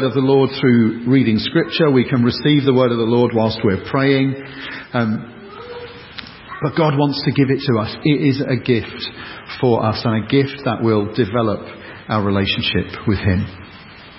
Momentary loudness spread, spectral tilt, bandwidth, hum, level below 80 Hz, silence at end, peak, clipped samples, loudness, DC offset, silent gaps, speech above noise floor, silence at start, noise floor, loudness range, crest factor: 18 LU; -11 dB/octave; 5.8 kHz; none; -42 dBFS; 0 s; -2 dBFS; under 0.1%; -17 LUFS; under 0.1%; none; 22 dB; 0 s; -39 dBFS; 6 LU; 16 dB